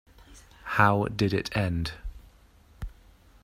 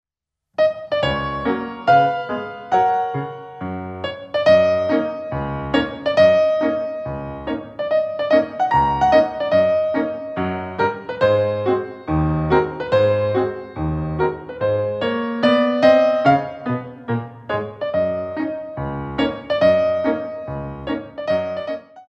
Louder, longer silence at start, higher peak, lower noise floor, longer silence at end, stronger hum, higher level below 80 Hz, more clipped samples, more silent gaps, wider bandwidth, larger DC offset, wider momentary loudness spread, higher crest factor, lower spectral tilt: second, -26 LUFS vs -20 LUFS; second, 0.3 s vs 0.6 s; about the same, -4 dBFS vs -2 dBFS; second, -57 dBFS vs -84 dBFS; first, 0.55 s vs 0.05 s; neither; about the same, -46 dBFS vs -42 dBFS; neither; neither; first, 15 kHz vs 7.6 kHz; neither; first, 22 LU vs 13 LU; first, 26 dB vs 18 dB; about the same, -6.5 dB/octave vs -7.5 dB/octave